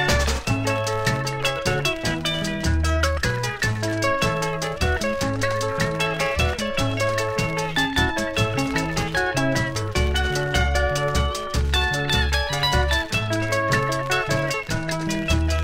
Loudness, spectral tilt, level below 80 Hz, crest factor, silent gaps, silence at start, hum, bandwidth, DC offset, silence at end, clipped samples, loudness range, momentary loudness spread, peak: -22 LUFS; -4.5 dB/octave; -30 dBFS; 16 dB; none; 0 s; none; 16 kHz; under 0.1%; 0 s; under 0.1%; 1 LU; 3 LU; -6 dBFS